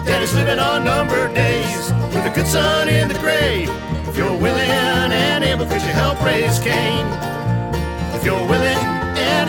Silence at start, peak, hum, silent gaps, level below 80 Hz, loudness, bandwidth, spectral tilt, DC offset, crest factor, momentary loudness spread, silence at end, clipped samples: 0 s; -2 dBFS; none; none; -32 dBFS; -17 LUFS; 19 kHz; -5 dB/octave; under 0.1%; 14 dB; 6 LU; 0 s; under 0.1%